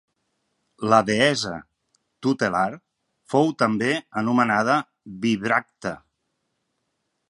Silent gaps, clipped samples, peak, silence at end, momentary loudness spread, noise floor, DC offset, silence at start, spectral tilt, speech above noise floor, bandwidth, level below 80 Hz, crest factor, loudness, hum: none; under 0.1%; -2 dBFS; 1.3 s; 13 LU; -76 dBFS; under 0.1%; 0.8 s; -5 dB/octave; 54 dB; 11.5 kHz; -62 dBFS; 24 dB; -22 LUFS; none